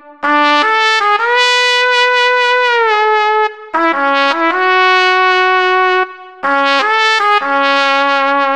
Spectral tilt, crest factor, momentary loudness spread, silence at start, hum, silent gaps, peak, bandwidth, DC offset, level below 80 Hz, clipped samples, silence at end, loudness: -0.5 dB/octave; 10 dB; 5 LU; 0.05 s; none; none; -2 dBFS; 12 kHz; 0.5%; -66 dBFS; under 0.1%; 0 s; -11 LUFS